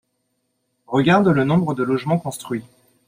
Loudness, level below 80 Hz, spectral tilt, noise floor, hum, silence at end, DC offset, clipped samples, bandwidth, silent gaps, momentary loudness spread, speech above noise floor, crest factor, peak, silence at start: -19 LUFS; -58 dBFS; -7 dB/octave; -72 dBFS; none; 0.45 s; under 0.1%; under 0.1%; 15.5 kHz; none; 13 LU; 53 dB; 18 dB; -2 dBFS; 0.9 s